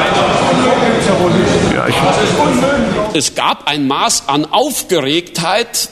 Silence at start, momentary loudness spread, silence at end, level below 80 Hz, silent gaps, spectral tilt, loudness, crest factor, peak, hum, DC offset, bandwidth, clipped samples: 0 s; 3 LU; 0 s; -38 dBFS; none; -4 dB/octave; -12 LUFS; 12 dB; 0 dBFS; none; under 0.1%; 13.5 kHz; under 0.1%